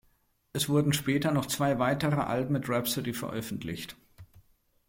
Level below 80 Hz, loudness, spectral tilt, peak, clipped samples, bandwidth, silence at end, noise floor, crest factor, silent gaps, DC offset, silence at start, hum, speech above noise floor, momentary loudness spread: -58 dBFS; -29 LUFS; -5 dB/octave; -14 dBFS; under 0.1%; 17 kHz; 0.65 s; -69 dBFS; 16 dB; none; under 0.1%; 0.55 s; none; 40 dB; 10 LU